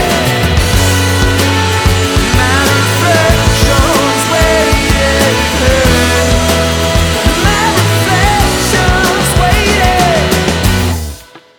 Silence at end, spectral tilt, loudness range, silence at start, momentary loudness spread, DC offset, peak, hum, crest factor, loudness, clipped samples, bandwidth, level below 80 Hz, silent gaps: 0.2 s; -4 dB/octave; 1 LU; 0 s; 2 LU; under 0.1%; 0 dBFS; none; 10 dB; -10 LUFS; under 0.1%; over 20 kHz; -18 dBFS; none